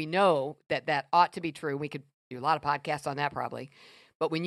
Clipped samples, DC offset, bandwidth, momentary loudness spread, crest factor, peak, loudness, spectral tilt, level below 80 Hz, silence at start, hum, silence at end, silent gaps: under 0.1%; under 0.1%; 13 kHz; 15 LU; 20 dB; -10 dBFS; -30 LUFS; -5.5 dB/octave; -72 dBFS; 0 s; none; 0 s; 2.14-2.31 s, 4.15-4.20 s